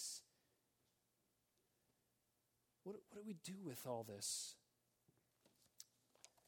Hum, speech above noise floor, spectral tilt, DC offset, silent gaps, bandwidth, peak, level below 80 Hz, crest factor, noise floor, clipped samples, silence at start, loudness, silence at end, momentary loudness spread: none; 35 dB; -3 dB/octave; under 0.1%; none; 17.5 kHz; -32 dBFS; under -90 dBFS; 24 dB; -86 dBFS; under 0.1%; 0 s; -51 LUFS; 0.2 s; 19 LU